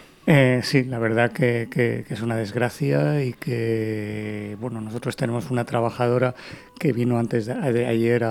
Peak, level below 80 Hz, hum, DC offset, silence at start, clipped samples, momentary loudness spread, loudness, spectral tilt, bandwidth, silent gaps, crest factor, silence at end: -2 dBFS; -58 dBFS; none; under 0.1%; 0 s; under 0.1%; 10 LU; -23 LUFS; -7 dB/octave; 15 kHz; none; 20 dB; 0 s